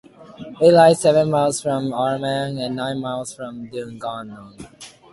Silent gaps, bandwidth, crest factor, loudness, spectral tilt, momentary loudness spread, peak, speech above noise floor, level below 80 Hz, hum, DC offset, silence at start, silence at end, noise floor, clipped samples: none; 11.5 kHz; 18 dB; -19 LUFS; -5 dB/octave; 25 LU; -2 dBFS; 19 dB; -58 dBFS; none; under 0.1%; 0.2 s; 0.25 s; -38 dBFS; under 0.1%